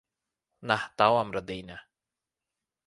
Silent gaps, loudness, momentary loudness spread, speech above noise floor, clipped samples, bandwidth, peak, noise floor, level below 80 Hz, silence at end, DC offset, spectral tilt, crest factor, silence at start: none; -27 LUFS; 21 LU; 62 dB; under 0.1%; 11.5 kHz; -8 dBFS; -90 dBFS; -64 dBFS; 1.05 s; under 0.1%; -5 dB/octave; 24 dB; 0.6 s